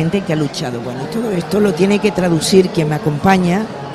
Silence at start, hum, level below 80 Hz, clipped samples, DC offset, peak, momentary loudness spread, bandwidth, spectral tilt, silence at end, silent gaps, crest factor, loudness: 0 s; none; -44 dBFS; under 0.1%; under 0.1%; 0 dBFS; 9 LU; 15 kHz; -6 dB/octave; 0 s; none; 14 dB; -15 LUFS